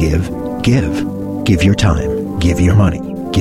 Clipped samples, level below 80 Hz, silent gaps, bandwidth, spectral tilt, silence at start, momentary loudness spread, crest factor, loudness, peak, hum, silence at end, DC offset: under 0.1%; -26 dBFS; none; 14.5 kHz; -6.5 dB/octave; 0 s; 8 LU; 12 dB; -15 LUFS; -2 dBFS; none; 0 s; under 0.1%